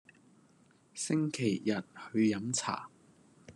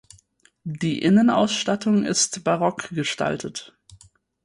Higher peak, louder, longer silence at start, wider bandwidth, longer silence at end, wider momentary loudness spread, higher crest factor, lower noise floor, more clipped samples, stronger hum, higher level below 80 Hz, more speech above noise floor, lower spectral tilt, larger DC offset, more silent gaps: second, -18 dBFS vs -6 dBFS; second, -33 LUFS vs -21 LUFS; first, 0.95 s vs 0.65 s; about the same, 12 kHz vs 11.5 kHz; second, 0.05 s vs 0.5 s; second, 11 LU vs 16 LU; about the same, 18 dB vs 16 dB; first, -65 dBFS vs -59 dBFS; neither; neither; second, -80 dBFS vs -60 dBFS; second, 32 dB vs 38 dB; about the same, -4.5 dB/octave vs -4 dB/octave; neither; neither